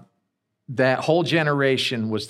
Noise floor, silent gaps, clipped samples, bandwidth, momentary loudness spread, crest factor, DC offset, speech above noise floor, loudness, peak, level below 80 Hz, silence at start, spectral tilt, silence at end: -76 dBFS; none; under 0.1%; 14 kHz; 4 LU; 16 dB; under 0.1%; 55 dB; -21 LUFS; -6 dBFS; -70 dBFS; 0.7 s; -5.5 dB/octave; 0 s